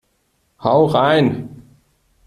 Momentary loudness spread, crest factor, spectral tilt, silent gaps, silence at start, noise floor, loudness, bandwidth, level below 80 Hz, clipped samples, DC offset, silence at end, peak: 15 LU; 16 dB; -7.5 dB/octave; none; 0.6 s; -65 dBFS; -16 LUFS; 13.5 kHz; -54 dBFS; under 0.1%; under 0.1%; 0.65 s; -2 dBFS